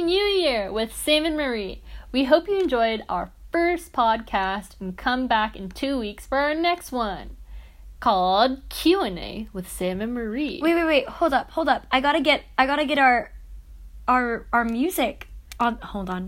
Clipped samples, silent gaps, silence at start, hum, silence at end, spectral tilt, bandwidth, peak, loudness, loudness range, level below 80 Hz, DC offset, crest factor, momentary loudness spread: under 0.1%; none; 0 s; none; 0 s; -4 dB/octave; 16.5 kHz; -4 dBFS; -23 LUFS; 4 LU; -44 dBFS; under 0.1%; 20 dB; 11 LU